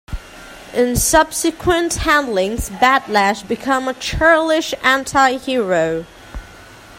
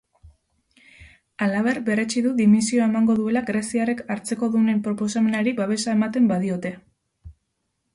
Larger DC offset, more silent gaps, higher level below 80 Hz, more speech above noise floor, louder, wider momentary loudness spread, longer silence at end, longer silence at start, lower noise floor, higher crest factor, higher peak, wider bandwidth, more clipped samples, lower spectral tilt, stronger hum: neither; neither; first, -34 dBFS vs -58 dBFS; second, 24 dB vs 54 dB; first, -16 LUFS vs -22 LUFS; first, 20 LU vs 8 LU; second, 0 s vs 0.65 s; second, 0.1 s vs 0.25 s; second, -40 dBFS vs -75 dBFS; about the same, 16 dB vs 14 dB; first, 0 dBFS vs -8 dBFS; first, 16.5 kHz vs 11.5 kHz; neither; second, -3 dB/octave vs -5.5 dB/octave; neither